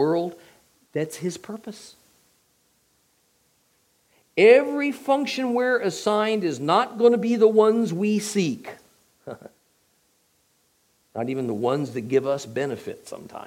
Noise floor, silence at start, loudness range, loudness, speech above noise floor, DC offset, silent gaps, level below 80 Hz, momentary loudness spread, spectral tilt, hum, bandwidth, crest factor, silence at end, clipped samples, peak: -66 dBFS; 0 s; 15 LU; -22 LUFS; 44 dB; under 0.1%; none; -74 dBFS; 21 LU; -5.5 dB/octave; none; 16 kHz; 22 dB; 0.05 s; under 0.1%; -2 dBFS